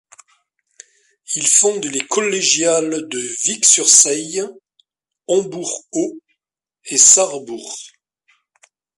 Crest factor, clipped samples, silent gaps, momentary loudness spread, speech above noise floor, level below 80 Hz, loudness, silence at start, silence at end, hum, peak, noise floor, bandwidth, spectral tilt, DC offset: 18 dB; under 0.1%; none; 18 LU; 64 dB; -68 dBFS; -14 LUFS; 1.3 s; 1.15 s; none; 0 dBFS; -81 dBFS; 16 kHz; -0.5 dB/octave; under 0.1%